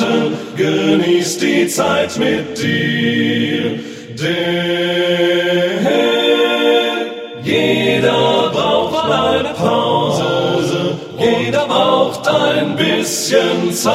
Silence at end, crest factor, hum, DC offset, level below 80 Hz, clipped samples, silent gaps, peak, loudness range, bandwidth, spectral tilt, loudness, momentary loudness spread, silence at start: 0 s; 14 dB; none; under 0.1%; -52 dBFS; under 0.1%; none; 0 dBFS; 2 LU; 16.5 kHz; -4.5 dB/octave; -15 LUFS; 5 LU; 0 s